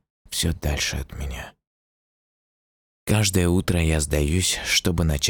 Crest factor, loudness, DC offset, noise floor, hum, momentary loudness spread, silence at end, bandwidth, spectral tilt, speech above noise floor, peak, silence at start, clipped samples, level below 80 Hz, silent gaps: 18 dB; -22 LUFS; under 0.1%; under -90 dBFS; none; 14 LU; 0 s; 19 kHz; -4 dB/octave; over 68 dB; -6 dBFS; 0.3 s; under 0.1%; -34 dBFS; 1.67-3.06 s